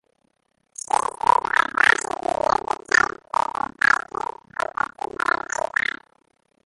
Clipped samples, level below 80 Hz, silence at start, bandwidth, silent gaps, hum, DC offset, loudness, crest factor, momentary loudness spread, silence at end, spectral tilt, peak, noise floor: under 0.1%; -56 dBFS; 0.95 s; 11.5 kHz; none; none; under 0.1%; -22 LUFS; 22 dB; 13 LU; 2.75 s; -1.5 dB/octave; -2 dBFS; -69 dBFS